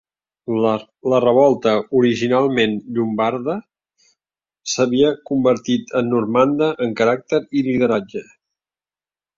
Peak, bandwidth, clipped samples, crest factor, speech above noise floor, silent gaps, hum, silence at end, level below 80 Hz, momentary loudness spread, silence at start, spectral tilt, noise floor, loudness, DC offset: -2 dBFS; 7.6 kHz; under 0.1%; 16 dB; over 73 dB; none; none; 1.15 s; -58 dBFS; 9 LU; 0.5 s; -5.5 dB/octave; under -90 dBFS; -18 LUFS; under 0.1%